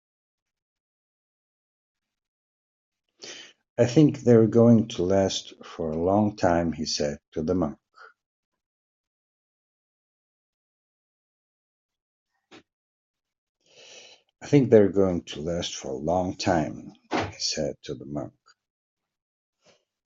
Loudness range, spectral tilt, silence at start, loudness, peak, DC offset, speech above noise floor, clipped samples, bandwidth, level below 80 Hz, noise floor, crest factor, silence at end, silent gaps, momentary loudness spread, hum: 11 LU; -6 dB/octave; 3.2 s; -24 LUFS; -4 dBFS; under 0.1%; 41 dB; under 0.1%; 7.8 kHz; -58 dBFS; -64 dBFS; 24 dB; 1.75 s; 3.70-3.76 s, 7.28-7.32 s, 8.26-8.52 s, 8.66-11.89 s, 12.02-12.26 s, 12.73-13.14 s, 13.38-13.55 s; 20 LU; none